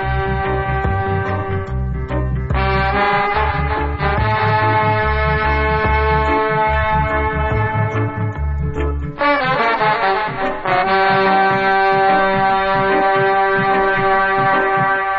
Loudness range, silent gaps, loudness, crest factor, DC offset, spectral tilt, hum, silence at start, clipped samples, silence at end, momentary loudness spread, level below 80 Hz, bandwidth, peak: 4 LU; none; -16 LUFS; 14 dB; under 0.1%; -8 dB/octave; none; 0 s; under 0.1%; 0 s; 7 LU; -26 dBFS; 6 kHz; -2 dBFS